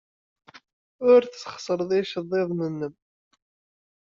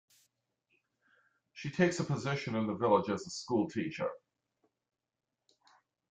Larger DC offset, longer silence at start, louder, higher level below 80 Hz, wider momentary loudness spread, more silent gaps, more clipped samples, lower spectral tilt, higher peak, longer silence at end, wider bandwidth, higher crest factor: neither; second, 1 s vs 1.55 s; first, -24 LUFS vs -34 LUFS; about the same, -70 dBFS vs -72 dBFS; first, 17 LU vs 10 LU; neither; neither; about the same, -5 dB/octave vs -6 dB/octave; first, -6 dBFS vs -12 dBFS; second, 1.25 s vs 1.95 s; second, 7.6 kHz vs 9.4 kHz; about the same, 20 dB vs 24 dB